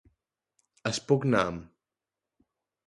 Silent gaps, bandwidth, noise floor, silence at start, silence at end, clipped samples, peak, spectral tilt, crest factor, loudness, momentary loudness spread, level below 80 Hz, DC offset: none; 11.5 kHz; -90 dBFS; 0.85 s; 1.2 s; under 0.1%; -10 dBFS; -5.5 dB/octave; 22 dB; -28 LUFS; 11 LU; -60 dBFS; under 0.1%